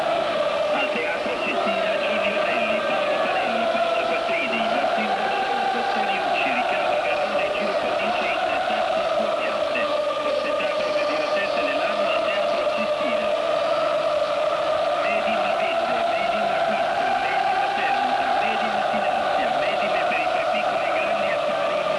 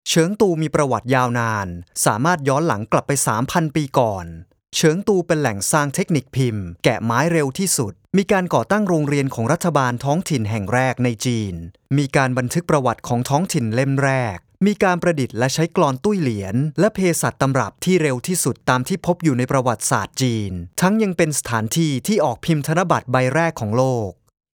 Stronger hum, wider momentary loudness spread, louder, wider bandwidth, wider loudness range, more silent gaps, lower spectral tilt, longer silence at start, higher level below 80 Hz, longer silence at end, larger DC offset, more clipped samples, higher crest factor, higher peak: neither; second, 1 LU vs 4 LU; second, -22 LUFS vs -19 LUFS; second, 11 kHz vs 19.5 kHz; about the same, 1 LU vs 1 LU; neither; second, -3.5 dB/octave vs -5 dB/octave; about the same, 0 s vs 0.05 s; second, -60 dBFS vs -50 dBFS; second, 0 s vs 0.45 s; neither; neither; second, 10 dB vs 18 dB; second, -12 dBFS vs 0 dBFS